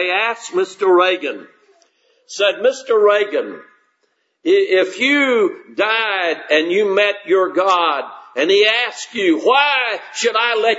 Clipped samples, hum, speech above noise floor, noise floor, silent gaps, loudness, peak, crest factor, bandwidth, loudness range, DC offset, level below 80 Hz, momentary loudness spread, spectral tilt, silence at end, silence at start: under 0.1%; none; 50 dB; -66 dBFS; none; -16 LUFS; 0 dBFS; 16 dB; 8 kHz; 3 LU; under 0.1%; -78 dBFS; 8 LU; -2.5 dB/octave; 0 s; 0 s